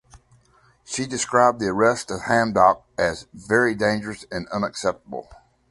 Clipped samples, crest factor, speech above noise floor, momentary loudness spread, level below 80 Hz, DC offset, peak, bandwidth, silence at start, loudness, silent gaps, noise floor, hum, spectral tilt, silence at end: under 0.1%; 20 dB; 37 dB; 14 LU; -52 dBFS; under 0.1%; -2 dBFS; 11.5 kHz; 0.15 s; -22 LUFS; none; -58 dBFS; none; -4 dB/octave; 0.35 s